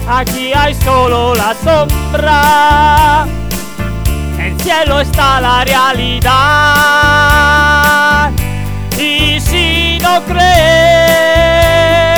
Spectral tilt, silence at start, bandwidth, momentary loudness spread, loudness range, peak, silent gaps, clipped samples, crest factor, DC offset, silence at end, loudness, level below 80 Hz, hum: -4 dB/octave; 0 s; over 20 kHz; 9 LU; 3 LU; 0 dBFS; none; 0.2%; 10 dB; under 0.1%; 0 s; -9 LUFS; -20 dBFS; none